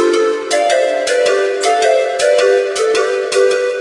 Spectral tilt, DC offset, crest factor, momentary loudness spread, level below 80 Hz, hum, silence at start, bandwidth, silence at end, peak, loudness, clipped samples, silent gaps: -1 dB/octave; under 0.1%; 12 dB; 3 LU; -64 dBFS; none; 0 s; 11.5 kHz; 0 s; -2 dBFS; -13 LUFS; under 0.1%; none